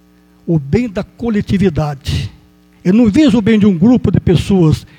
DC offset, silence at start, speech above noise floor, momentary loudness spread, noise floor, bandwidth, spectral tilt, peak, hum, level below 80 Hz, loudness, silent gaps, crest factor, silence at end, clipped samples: under 0.1%; 0.45 s; 34 dB; 11 LU; -45 dBFS; 10.5 kHz; -7.5 dB/octave; 0 dBFS; none; -32 dBFS; -13 LUFS; none; 12 dB; 0.15 s; under 0.1%